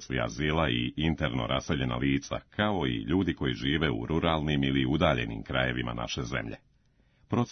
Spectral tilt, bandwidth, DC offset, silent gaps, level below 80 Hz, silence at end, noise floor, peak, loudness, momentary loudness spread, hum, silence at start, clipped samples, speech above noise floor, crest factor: -6 dB/octave; 6.6 kHz; under 0.1%; none; -46 dBFS; 0 s; -66 dBFS; -12 dBFS; -29 LUFS; 6 LU; none; 0 s; under 0.1%; 37 dB; 18 dB